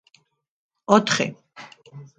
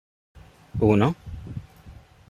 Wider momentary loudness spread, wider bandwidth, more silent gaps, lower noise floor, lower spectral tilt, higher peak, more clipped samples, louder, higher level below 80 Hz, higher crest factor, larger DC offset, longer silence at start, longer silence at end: first, 25 LU vs 19 LU; about the same, 9.2 kHz vs 9.8 kHz; neither; first, -62 dBFS vs -48 dBFS; second, -4 dB/octave vs -8.5 dB/octave; first, 0 dBFS vs -6 dBFS; neither; first, -20 LUFS vs -23 LUFS; second, -64 dBFS vs -46 dBFS; about the same, 24 dB vs 20 dB; neither; first, 0.9 s vs 0.75 s; second, 0.15 s vs 0.4 s